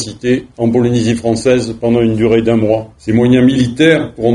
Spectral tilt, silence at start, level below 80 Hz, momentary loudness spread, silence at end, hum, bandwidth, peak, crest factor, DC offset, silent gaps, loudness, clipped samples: -6.5 dB/octave; 0 s; -40 dBFS; 6 LU; 0 s; none; 11 kHz; 0 dBFS; 12 dB; under 0.1%; none; -12 LUFS; under 0.1%